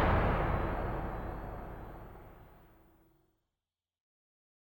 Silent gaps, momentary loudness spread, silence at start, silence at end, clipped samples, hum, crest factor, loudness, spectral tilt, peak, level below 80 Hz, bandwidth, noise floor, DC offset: none; 23 LU; 0 s; 2.15 s; under 0.1%; none; 20 dB; -36 LUFS; -8.5 dB/octave; -16 dBFS; -42 dBFS; 19 kHz; under -90 dBFS; under 0.1%